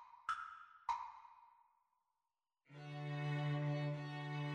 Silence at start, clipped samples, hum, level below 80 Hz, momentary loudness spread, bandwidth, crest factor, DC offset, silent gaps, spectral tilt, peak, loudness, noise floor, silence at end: 0 s; under 0.1%; none; -82 dBFS; 16 LU; 8.8 kHz; 18 dB; under 0.1%; none; -7 dB/octave; -28 dBFS; -44 LUFS; under -90 dBFS; 0 s